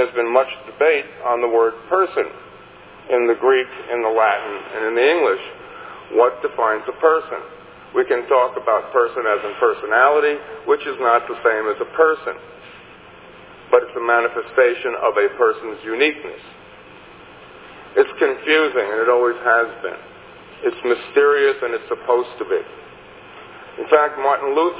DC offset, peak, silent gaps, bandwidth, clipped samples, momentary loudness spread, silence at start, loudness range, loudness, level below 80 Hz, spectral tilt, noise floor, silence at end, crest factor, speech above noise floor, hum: under 0.1%; 0 dBFS; none; 4 kHz; under 0.1%; 14 LU; 0 s; 3 LU; -18 LUFS; -62 dBFS; -7 dB/octave; -42 dBFS; 0 s; 18 dB; 24 dB; none